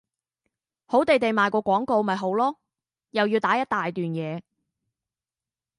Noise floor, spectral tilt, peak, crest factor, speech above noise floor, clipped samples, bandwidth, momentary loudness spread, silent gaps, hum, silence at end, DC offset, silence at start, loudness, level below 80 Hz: under -90 dBFS; -6.5 dB/octave; -6 dBFS; 20 dB; over 67 dB; under 0.1%; 11.5 kHz; 10 LU; none; none; 1.4 s; under 0.1%; 0.9 s; -24 LUFS; -68 dBFS